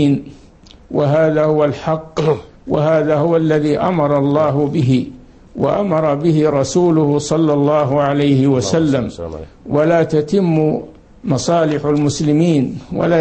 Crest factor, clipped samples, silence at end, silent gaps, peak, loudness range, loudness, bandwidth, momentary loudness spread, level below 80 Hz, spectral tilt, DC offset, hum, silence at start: 14 dB; under 0.1%; 0 s; none; -2 dBFS; 2 LU; -15 LUFS; 8.8 kHz; 8 LU; -44 dBFS; -7 dB/octave; under 0.1%; none; 0 s